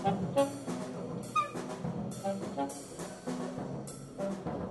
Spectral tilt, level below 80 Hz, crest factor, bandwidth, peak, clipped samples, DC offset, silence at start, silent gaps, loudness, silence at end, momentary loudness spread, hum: -6 dB/octave; -62 dBFS; 20 dB; 12 kHz; -16 dBFS; under 0.1%; under 0.1%; 0 s; none; -37 LUFS; 0 s; 10 LU; none